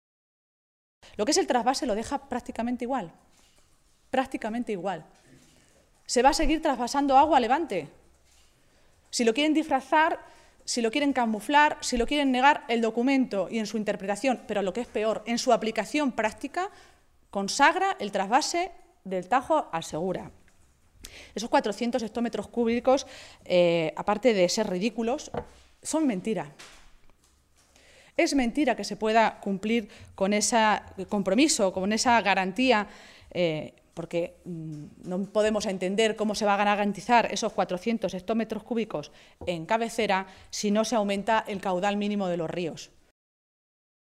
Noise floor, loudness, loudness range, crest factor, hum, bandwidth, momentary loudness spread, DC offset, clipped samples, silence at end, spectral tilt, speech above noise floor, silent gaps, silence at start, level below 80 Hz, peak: -63 dBFS; -26 LUFS; 6 LU; 20 dB; none; 15 kHz; 14 LU; under 0.1%; under 0.1%; 1.25 s; -4 dB/octave; 37 dB; none; 1.2 s; -50 dBFS; -6 dBFS